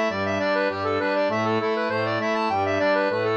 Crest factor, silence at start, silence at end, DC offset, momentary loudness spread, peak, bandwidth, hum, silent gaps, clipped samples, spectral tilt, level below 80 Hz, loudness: 12 dB; 0 s; 0 s; under 0.1%; 3 LU; -10 dBFS; 8.4 kHz; none; none; under 0.1%; -5.5 dB/octave; -68 dBFS; -23 LUFS